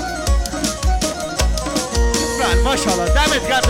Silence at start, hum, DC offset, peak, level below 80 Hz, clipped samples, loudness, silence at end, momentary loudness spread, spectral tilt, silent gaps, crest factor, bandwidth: 0 s; none; under 0.1%; -2 dBFS; -20 dBFS; under 0.1%; -18 LUFS; 0 s; 5 LU; -3.5 dB/octave; none; 16 dB; 16.5 kHz